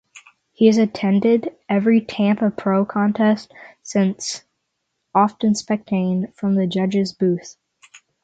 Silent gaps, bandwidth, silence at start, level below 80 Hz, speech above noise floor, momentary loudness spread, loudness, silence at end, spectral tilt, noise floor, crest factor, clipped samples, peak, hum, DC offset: none; 8.8 kHz; 0.15 s; -64 dBFS; 56 dB; 7 LU; -19 LUFS; 0.25 s; -6.5 dB/octave; -75 dBFS; 18 dB; under 0.1%; -2 dBFS; none; under 0.1%